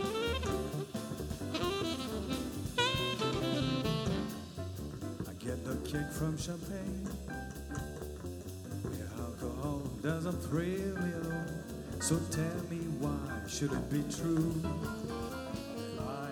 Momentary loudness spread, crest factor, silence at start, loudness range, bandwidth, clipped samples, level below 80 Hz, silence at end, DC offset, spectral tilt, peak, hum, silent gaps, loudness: 9 LU; 20 dB; 0 s; 5 LU; over 20 kHz; under 0.1%; -52 dBFS; 0 s; under 0.1%; -5 dB/octave; -16 dBFS; none; none; -37 LUFS